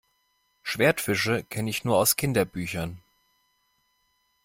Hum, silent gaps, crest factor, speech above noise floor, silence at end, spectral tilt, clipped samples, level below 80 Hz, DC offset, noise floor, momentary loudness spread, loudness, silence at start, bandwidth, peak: none; none; 20 dB; 46 dB; 1.45 s; -4 dB/octave; under 0.1%; -56 dBFS; under 0.1%; -71 dBFS; 12 LU; -25 LUFS; 0.65 s; 16.5 kHz; -8 dBFS